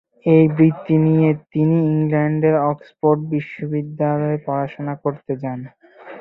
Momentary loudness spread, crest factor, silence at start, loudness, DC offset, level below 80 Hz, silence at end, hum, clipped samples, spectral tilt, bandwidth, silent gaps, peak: 11 LU; 16 dB; 0.25 s; -18 LUFS; under 0.1%; -58 dBFS; 0 s; none; under 0.1%; -12 dB/octave; 4 kHz; none; -2 dBFS